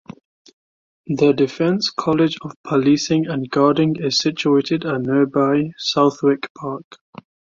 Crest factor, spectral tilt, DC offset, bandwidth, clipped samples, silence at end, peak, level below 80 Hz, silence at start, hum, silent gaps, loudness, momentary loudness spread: 16 dB; -5.5 dB/octave; under 0.1%; 7.6 kHz; under 0.1%; 0.75 s; -4 dBFS; -60 dBFS; 1.05 s; none; 2.56-2.64 s, 6.50-6.55 s; -18 LUFS; 8 LU